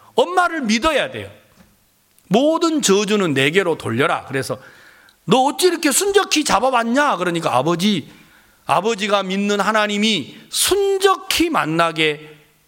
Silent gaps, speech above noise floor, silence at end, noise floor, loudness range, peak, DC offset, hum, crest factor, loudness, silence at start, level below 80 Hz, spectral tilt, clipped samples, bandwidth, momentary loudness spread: none; 40 dB; 0.35 s; -58 dBFS; 2 LU; -2 dBFS; under 0.1%; none; 18 dB; -17 LUFS; 0.15 s; -52 dBFS; -3.5 dB/octave; under 0.1%; 17 kHz; 9 LU